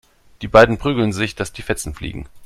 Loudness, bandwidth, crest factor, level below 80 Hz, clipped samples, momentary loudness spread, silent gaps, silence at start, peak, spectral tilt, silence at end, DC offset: -17 LUFS; 13.5 kHz; 18 dB; -36 dBFS; under 0.1%; 18 LU; none; 0.4 s; 0 dBFS; -5 dB/octave; 0 s; under 0.1%